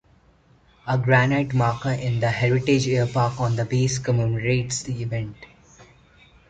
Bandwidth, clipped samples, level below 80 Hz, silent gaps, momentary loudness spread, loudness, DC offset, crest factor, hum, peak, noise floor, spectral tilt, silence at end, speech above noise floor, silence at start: 9.2 kHz; under 0.1%; -50 dBFS; none; 9 LU; -22 LUFS; under 0.1%; 18 dB; none; -4 dBFS; -57 dBFS; -6 dB/octave; 0.65 s; 35 dB; 0.85 s